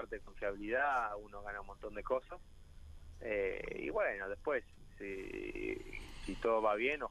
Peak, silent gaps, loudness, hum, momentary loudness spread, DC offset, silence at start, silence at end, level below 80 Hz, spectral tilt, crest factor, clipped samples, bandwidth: -22 dBFS; none; -39 LUFS; none; 15 LU; under 0.1%; 0 s; 0 s; -54 dBFS; -5.5 dB/octave; 18 dB; under 0.1%; 13 kHz